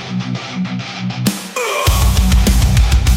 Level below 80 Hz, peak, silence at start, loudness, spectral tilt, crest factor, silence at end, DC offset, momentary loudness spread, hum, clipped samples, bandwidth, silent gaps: -16 dBFS; 0 dBFS; 0 s; -16 LUFS; -5 dB/octave; 12 dB; 0 s; under 0.1%; 9 LU; none; under 0.1%; 17 kHz; none